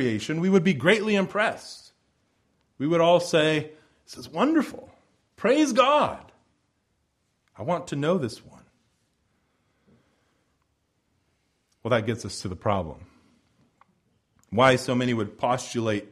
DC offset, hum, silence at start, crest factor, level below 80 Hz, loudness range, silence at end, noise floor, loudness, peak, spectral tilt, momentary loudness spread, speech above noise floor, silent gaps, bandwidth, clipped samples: under 0.1%; none; 0 s; 22 dB; -60 dBFS; 9 LU; 0.05 s; -73 dBFS; -24 LUFS; -4 dBFS; -5.5 dB/octave; 19 LU; 49 dB; none; 13.5 kHz; under 0.1%